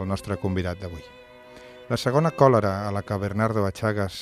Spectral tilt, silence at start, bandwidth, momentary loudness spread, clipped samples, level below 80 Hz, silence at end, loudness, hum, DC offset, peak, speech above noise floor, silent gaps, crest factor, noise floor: -7 dB/octave; 0 s; 14.5 kHz; 18 LU; under 0.1%; -54 dBFS; 0 s; -24 LUFS; none; under 0.1%; -4 dBFS; 22 dB; none; 22 dB; -46 dBFS